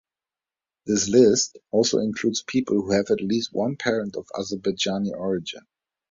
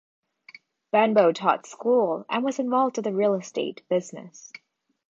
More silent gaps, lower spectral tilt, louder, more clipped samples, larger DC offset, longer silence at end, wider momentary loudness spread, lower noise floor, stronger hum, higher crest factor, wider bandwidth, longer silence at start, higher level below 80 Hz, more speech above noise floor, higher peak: neither; second, -4 dB/octave vs -5.5 dB/octave; about the same, -23 LUFS vs -24 LUFS; neither; neither; about the same, 0.55 s vs 0.65 s; second, 13 LU vs 21 LU; first, under -90 dBFS vs -52 dBFS; neither; about the same, 20 dB vs 20 dB; about the same, 7.8 kHz vs 7.8 kHz; about the same, 0.85 s vs 0.95 s; first, -58 dBFS vs -80 dBFS; first, over 67 dB vs 28 dB; about the same, -4 dBFS vs -4 dBFS